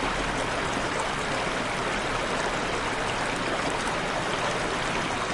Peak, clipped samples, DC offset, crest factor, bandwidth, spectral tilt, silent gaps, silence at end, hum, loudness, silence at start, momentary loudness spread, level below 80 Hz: -14 dBFS; under 0.1%; under 0.1%; 14 dB; 11.5 kHz; -3.5 dB/octave; none; 0 s; none; -27 LUFS; 0 s; 1 LU; -42 dBFS